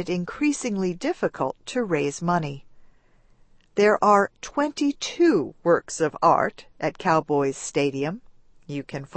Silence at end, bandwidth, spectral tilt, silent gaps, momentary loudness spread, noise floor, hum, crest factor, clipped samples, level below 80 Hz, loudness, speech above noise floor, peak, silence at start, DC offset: 0 s; 8.8 kHz; -5 dB/octave; none; 11 LU; -57 dBFS; none; 20 dB; under 0.1%; -58 dBFS; -24 LUFS; 33 dB; -4 dBFS; 0 s; under 0.1%